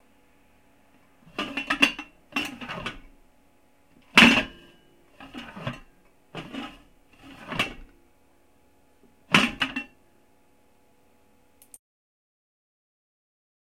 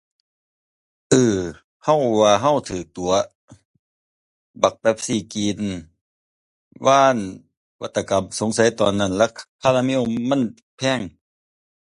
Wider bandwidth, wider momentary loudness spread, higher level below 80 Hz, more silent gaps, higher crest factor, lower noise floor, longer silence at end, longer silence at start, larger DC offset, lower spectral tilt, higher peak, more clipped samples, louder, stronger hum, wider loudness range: first, 16.5 kHz vs 11.5 kHz; first, 25 LU vs 12 LU; about the same, -56 dBFS vs -52 dBFS; second, none vs 1.64-1.80 s, 3.35-3.48 s, 3.65-4.54 s, 6.01-6.71 s, 7.57-7.79 s, 9.48-9.59 s, 10.62-10.78 s; first, 30 dB vs 20 dB; second, -63 dBFS vs under -90 dBFS; first, 3.95 s vs 0.9 s; first, 1.4 s vs 1.1 s; neither; second, -3 dB/octave vs -4.5 dB/octave; about the same, 0 dBFS vs 0 dBFS; neither; second, -23 LUFS vs -20 LUFS; neither; first, 14 LU vs 4 LU